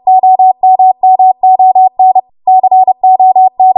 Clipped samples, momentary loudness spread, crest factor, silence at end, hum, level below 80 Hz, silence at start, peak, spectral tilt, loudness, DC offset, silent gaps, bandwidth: under 0.1%; 3 LU; 6 dB; 0.05 s; none; -64 dBFS; 0.05 s; 0 dBFS; -9.5 dB/octave; -7 LUFS; under 0.1%; none; 1.1 kHz